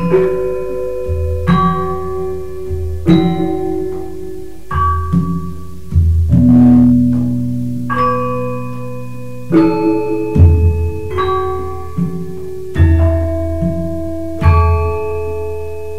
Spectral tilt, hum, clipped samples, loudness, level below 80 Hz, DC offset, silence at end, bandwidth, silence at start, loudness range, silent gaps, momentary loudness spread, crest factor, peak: -9 dB/octave; none; under 0.1%; -15 LUFS; -24 dBFS; 6%; 0 s; 7 kHz; 0 s; 5 LU; none; 15 LU; 14 dB; 0 dBFS